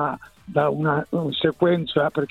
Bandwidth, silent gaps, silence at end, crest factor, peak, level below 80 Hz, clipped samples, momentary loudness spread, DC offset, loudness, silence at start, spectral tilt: 10 kHz; none; 0.05 s; 16 dB; -6 dBFS; -56 dBFS; under 0.1%; 7 LU; under 0.1%; -22 LUFS; 0 s; -8 dB/octave